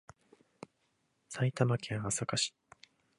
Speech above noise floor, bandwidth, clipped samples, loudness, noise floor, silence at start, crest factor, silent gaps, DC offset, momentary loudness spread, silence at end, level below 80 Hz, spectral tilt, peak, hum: 44 dB; 11.5 kHz; under 0.1%; -34 LUFS; -77 dBFS; 1.3 s; 24 dB; none; under 0.1%; 23 LU; 0.7 s; -68 dBFS; -4 dB/octave; -14 dBFS; none